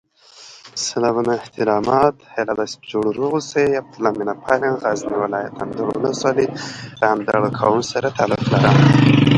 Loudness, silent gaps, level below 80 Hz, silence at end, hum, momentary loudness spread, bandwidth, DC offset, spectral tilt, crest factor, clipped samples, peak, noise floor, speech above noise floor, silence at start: -18 LUFS; none; -50 dBFS; 0 s; none; 11 LU; 9.4 kHz; under 0.1%; -6 dB/octave; 18 dB; under 0.1%; 0 dBFS; -44 dBFS; 26 dB; 0.4 s